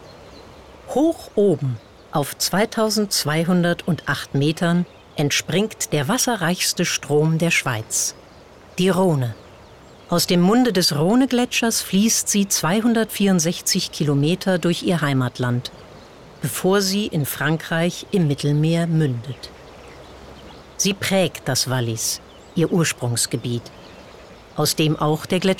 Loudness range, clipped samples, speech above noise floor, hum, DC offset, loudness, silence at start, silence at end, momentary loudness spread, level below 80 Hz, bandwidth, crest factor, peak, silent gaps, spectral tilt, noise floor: 5 LU; under 0.1%; 25 dB; none; under 0.1%; -20 LUFS; 0 s; 0 s; 9 LU; -52 dBFS; 17.5 kHz; 12 dB; -8 dBFS; none; -4.5 dB/octave; -45 dBFS